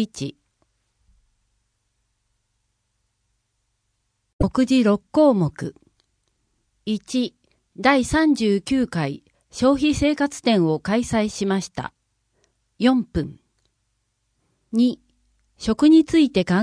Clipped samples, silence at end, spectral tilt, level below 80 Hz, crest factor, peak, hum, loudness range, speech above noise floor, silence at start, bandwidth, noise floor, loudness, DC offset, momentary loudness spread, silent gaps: under 0.1%; 0 s; -5.5 dB/octave; -44 dBFS; 20 dB; -4 dBFS; 50 Hz at -50 dBFS; 6 LU; 53 dB; 0 s; 10.5 kHz; -73 dBFS; -20 LUFS; under 0.1%; 16 LU; 4.33-4.39 s